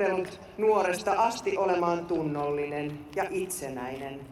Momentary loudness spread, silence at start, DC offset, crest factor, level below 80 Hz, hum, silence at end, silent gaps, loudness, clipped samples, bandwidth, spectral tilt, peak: 10 LU; 0 s; under 0.1%; 16 dB; -60 dBFS; none; 0 s; none; -29 LUFS; under 0.1%; 14.5 kHz; -5 dB/octave; -12 dBFS